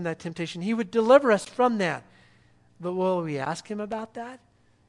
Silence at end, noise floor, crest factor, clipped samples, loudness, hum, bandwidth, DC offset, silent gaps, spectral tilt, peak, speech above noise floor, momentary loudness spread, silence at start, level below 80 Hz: 0.55 s; -59 dBFS; 22 dB; under 0.1%; -25 LUFS; none; 11.5 kHz; under 0.1%; none; -6 dB/octave; -4 dBFS; 34 dB; 18 LU; 0 s; -68 dBFS